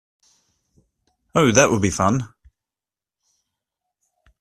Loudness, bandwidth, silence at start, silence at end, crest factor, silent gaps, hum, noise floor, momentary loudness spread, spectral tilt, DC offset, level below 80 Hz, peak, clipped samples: -18 LUFS; 14 kHz; 1.35 s; 2.15 s; 24 dB; none; none; -90 dBFS; 11 LU; -4.5 dB/octave; under 0.1%; -52 dBFS; 0 dBFS; under 0.1%